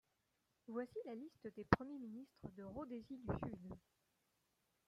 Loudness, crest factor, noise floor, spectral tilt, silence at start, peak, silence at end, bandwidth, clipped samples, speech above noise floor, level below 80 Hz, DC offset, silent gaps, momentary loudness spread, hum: -47 LUFS; 36 dB; -85 dBFS; -8 dB/octave; 0.7 s; -12 dBFS; 1.1 s; 14.5 kHz; under 0.1%; 39 dB; -66 dBFS; under 0.1%; none; 17 LU; none